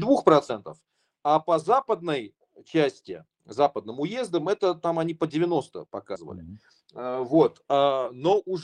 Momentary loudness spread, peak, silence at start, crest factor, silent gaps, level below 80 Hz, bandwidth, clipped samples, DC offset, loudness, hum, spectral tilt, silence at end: 16 LU; -4 dBFS; 0 s; 22 dB; none; -68 dBFS; 10.5 kHz; under 0.1%; under 0.1%; -25 LUFS; none; -6.5 dB/octave; 0 s